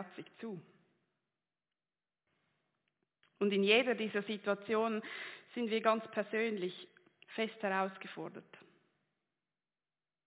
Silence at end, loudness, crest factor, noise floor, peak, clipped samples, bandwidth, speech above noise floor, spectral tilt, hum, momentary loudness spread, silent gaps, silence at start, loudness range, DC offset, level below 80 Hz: 1.65 s; -35 LUFS; 24 dB; under -90 dBFS; -14 dBFS; under 0.1%; 4 kHz; over 54 dB; -2.5 dB/octave; none; 18 LU; none; 0 s; 9 LU; under 0.1%; under -90 dBFS